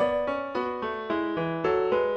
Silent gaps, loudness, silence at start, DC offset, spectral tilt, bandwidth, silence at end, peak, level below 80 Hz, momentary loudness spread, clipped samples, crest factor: none; -28 LUFS; 0 s; under 0.1%; -7.5 dB/octave; 8.2 kHz; 0 s; -14 dBFS; -56 dBFS; 6 LU; under 0.1%; 14 dB